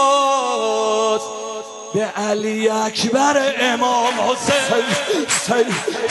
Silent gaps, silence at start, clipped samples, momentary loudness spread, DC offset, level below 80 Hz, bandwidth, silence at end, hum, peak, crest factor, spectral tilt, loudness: none; 0 s; under 0.1%; 7 LU; under 0.1%; -62 dBFS; 12 kHz; 0 s; none; -4 dBFS; 14 dB; -2.5 dB/octave; -18 LUFS